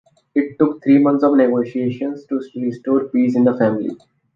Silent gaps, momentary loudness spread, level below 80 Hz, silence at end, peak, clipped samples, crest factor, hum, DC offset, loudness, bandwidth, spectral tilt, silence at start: none; 11 LU; -64 dBFS; 0.4 s; -2 dBFS; under 0.1%; 16 dB; none; under 0.1%; -17 LUFS; 5.4 kHz; -9.5 dB/octave; 0.35 s